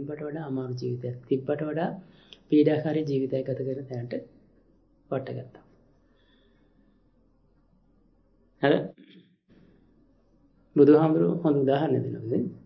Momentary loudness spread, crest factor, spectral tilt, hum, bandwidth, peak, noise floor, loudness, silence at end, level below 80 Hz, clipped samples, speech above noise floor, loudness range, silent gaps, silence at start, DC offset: 14 LU; 22 dB; -9.5 dB/octave; none; 6.2 kHz; -6 dBFS; -64 dBFS; -26 LUFS; 0.05 s; -66 dBFS; under 0.1%; 39 dB; 17 LU; none; 0 s; under 0.1%